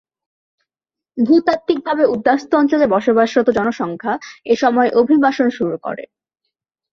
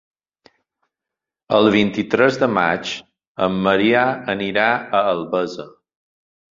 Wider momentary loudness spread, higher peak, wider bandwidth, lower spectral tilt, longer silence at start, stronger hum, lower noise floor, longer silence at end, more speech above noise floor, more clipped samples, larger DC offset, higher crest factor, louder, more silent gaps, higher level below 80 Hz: about the same, 10 LU vs 11 LU; about the same, -2 dBFS vs -2 dBFS; about the same, 7.4 kHz vs 7.6 kHz; about the same, -6 dB/octave vs -5.5 dB/octave; second, 1.15 s vs 1.5 s; neither; about the same, -88 dBFS vs -86 dBFS; about the same, 0.9 s vs 0.9 s; first, 72 dB vs 68 dB; neither; neither; about the same, 14 dB vs 18 dB; about the same, -16 LUFS vs -18 LUFS; second, none vs 3.27-3.35 s; about the same, -58 dBFS vs -56 dBFS